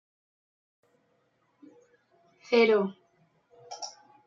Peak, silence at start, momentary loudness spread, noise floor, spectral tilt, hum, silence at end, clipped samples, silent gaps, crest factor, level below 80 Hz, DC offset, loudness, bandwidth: -12 dBFS; 2.5 s; 19 LU; -71 dBFS; -4.5 dB/octave; none; 0.35 s; under 0.1%; none; 22 dB; -86 dBFS; under 0.1%; -25 LUFS; 7.6 kHz